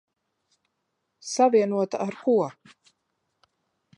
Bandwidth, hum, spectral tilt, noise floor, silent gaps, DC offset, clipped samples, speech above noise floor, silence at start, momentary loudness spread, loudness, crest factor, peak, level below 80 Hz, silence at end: 11 kHz; none; -5 dB/octave; -78 dBFS; none; under 0.1%; under 0.1%; 55 dB; 1.25 s; 13 LU; -24 LUFS; 20 dB; -8 dBFS; -82 dBFS; 1.45 s